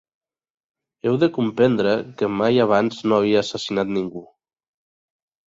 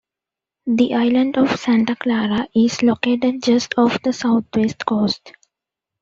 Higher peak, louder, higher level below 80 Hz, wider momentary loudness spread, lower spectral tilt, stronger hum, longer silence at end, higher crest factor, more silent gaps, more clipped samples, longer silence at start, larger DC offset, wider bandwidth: about the same, -4 dBFS vs -2 dBFS; about the same, -20 LUFS vs -18 LUFS; about the same, -60 dBFS vs -58 dBFS; first, 8 LU vs 4 LU; first, -6.5 dB/octave vs -5 dB/octave; neither; first, 1.25 s vs 0.7 s; about the same, 18 dB vs 16 dB; neither; neither; first, 1.05 s vs 0.65 s; neither; about the same, 7.8 kHz vs 7.6 kHz